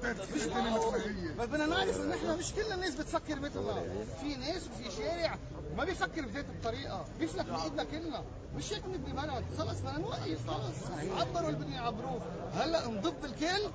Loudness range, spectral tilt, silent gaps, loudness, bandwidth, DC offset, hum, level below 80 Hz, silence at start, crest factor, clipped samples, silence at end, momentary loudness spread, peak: 4 LU; -5 dB/octave; none; -36 LUFS; 8 kHz; under 0.1%; none; -50 dBFS; 0 s; 18 dB; under 0.1%; 0 s; 7 LU; -18 dBFS